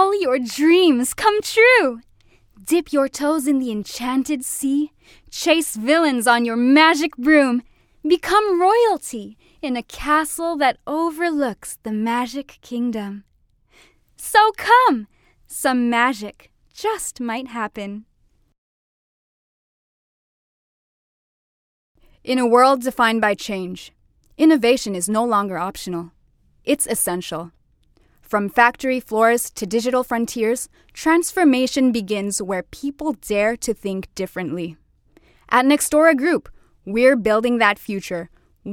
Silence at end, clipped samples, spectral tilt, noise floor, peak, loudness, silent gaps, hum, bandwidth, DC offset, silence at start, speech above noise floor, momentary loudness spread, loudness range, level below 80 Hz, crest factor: 0 s; under 0.1%; -3.5 dB/octave; -61 dBFS; 0 dBFS; -19 LUFS; 18.58-21.95 s; none; 17.5 kHz; under 0.1%; 0 s; 42 dB; 15 LU; 8 LU; -54 dBFS; 20 dB